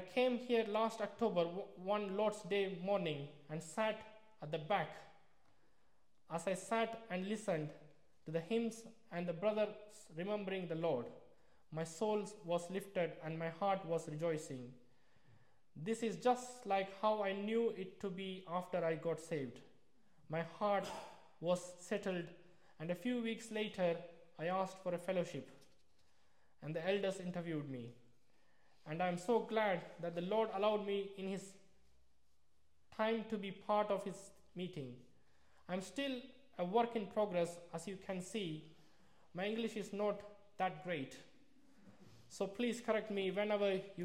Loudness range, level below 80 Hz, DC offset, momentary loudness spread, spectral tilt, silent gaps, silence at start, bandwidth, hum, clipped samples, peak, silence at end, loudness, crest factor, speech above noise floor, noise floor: 4 LU; -82 dBFS; under 0.1%; 13 LU; -5.5 dB/octave; none; 0 s; 16 kHz; none; under 0.1%; -22 dBFS; 0 s; -41 LUFS; 18 dB; 40 dB; -80 dBFS